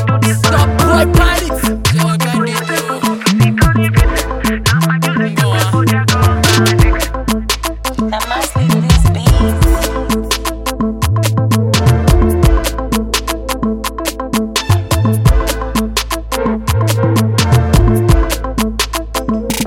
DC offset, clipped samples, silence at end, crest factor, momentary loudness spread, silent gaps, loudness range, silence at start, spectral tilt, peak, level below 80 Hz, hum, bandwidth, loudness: under 0.1%; under 0.1%; 0 s; 12 dB; 7 LU; none; 2 LU; 0 s; -5 dB/octave; 0 dBFS; -18 dBFS; none; 17 kHz; -13 LUFS